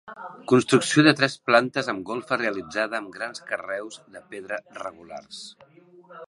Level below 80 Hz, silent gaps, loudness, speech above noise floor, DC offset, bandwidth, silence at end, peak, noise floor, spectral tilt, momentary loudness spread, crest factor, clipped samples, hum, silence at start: -70 dBFS; none; -23 LUFS; 23 dB; under 0.1%; 11.5 kHz; 0.05 s; -2 dBFS; -48 dBFS; -4.5 dB/octave; 21 LU; 24 dB; under 0.1%; none; 0.05 s